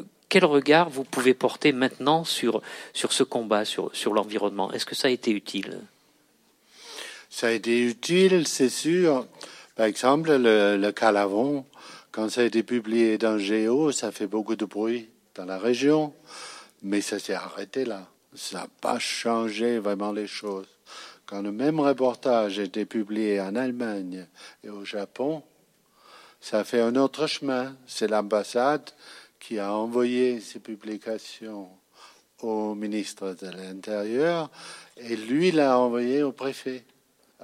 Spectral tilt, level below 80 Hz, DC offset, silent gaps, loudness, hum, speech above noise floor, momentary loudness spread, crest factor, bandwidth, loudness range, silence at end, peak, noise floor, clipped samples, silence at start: -4.5 dB/octave; -82 dBFS; under 0.1%; none; -25 LUFS; none; 38 dB; 18 LU; 22 dB; 15.5 kHz; 8 LU; 0.65 s; -4 dBFS; -64 dBFS; under 0.1%; 0 s